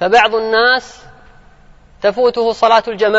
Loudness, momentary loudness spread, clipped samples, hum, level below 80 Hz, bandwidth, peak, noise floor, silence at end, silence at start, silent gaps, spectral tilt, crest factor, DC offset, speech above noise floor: -13 LUFS; 6 LU; under 0.1%; none; -46 dBFS; 8 kHz; 0 dBFS; -43 dBFS; 0 s; 0 s; none; -3.5 dB/octave; 14 dB; under 0.1%; 31 dB